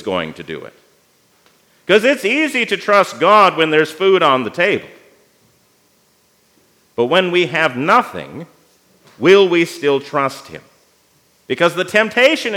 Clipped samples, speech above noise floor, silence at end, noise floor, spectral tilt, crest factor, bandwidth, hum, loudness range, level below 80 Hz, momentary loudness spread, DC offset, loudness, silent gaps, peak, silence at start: under 0.1%; 42 dB; 0 s; -57 dBFS; -4.5 dB/octave; 16 dB; 16.5 kHz; none; 6 LU; -68 dBFS; 19 LU; under 0.1%; -14 LUFS; none; 0 dBFS; 0 s